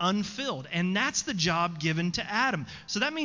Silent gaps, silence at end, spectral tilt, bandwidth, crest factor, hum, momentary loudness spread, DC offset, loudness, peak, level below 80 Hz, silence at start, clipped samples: none; 0 s; -3.5 dB/octave; 7.8 kHz; 16 dB; none; 6 LU; under 0.1%; -28 LUFS; -12 dBFS; -58 dBFS; 0 s; under 0.1%